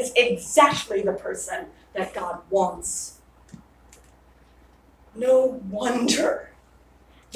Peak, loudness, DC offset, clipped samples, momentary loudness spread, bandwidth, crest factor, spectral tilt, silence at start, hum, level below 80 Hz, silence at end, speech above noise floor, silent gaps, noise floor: -2 dBFS; -23 LUFS; under 0.1%; under 0.1%; 14 LU; 16 kHz; 22 dB; -3 dB/octave; 0 s; none; -56 dBFS; 0 s; 32 dB; none; -55 dBFS